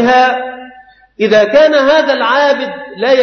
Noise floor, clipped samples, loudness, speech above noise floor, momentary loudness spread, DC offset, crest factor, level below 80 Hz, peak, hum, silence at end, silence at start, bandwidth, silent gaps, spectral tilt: -40 dBFS; under 0.1%; -10 LUFS; 30 dB; 13 LU; under 0.1%; 10 dB; -52 dBFS; 0 dBFS; none; 0 s; 0 s; 6.6 kHz; none; -4 dB/octave